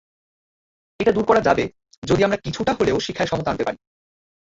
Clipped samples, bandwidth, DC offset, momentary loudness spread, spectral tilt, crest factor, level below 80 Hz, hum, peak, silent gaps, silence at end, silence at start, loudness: under 0.1%; 7.8 kHz; under 0.1%; 10 LU; -5.5 dB/octave; 20 dB; -46 dBFS; none; -2 dBFS; 1.97-2.02 s; 0.75 s; 1 s; -21 LUFS